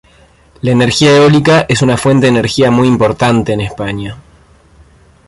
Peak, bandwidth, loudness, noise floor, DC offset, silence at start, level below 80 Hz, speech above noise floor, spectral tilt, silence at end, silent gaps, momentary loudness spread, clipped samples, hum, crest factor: 0 dBFS; 11.5 kHz; -10 LUFS; -45 dBFS; under 0.1%; 0.65 s; -38 dBFS; 35 dB; -5.5 dB/octave; 1.1 s; none; 13 LU; under 0.1%; none; 12 dB